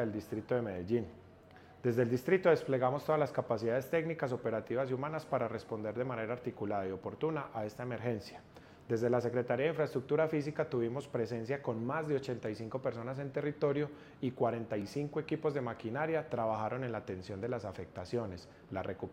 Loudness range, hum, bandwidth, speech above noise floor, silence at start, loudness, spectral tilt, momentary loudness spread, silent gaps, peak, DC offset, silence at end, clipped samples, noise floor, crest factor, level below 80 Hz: 5 LU; none; 16 kHz; 22 dB; 0 s; -36 LUFS; -7.5 dB/octave; 9 LU; none; -16 dBFS; under 0.1%; 0 s; under 0.1%; -57 dBFS; 20 dB; -68 dBFS